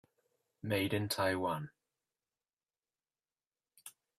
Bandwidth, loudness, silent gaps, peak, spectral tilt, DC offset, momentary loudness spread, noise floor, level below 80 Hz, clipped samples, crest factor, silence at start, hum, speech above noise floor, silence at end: 15.5 kHz; -35 LUFS; 3.47-3.51 s; -20 dBFS; -5 dB/octave; under 0.1%; 21 LU; under -90 dBFS; -74 dBFS; under 0.1%; 20 dB; 0.65 s; none; over 55 dB; 0.3 s